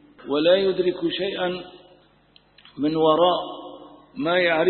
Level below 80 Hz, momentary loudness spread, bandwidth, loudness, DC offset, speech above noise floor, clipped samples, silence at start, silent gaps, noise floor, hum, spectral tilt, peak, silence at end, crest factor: -60 dBFS; 19 LU; 4.4 kHz; -22 LUFS; under 0.1%; 36 dB; under 0.1%; 0.2 s; none; -57 dBFS; 50 Hz at -60 dBFS; -9.5 dB/octave; -6 dBFS; 0 s; 18 dB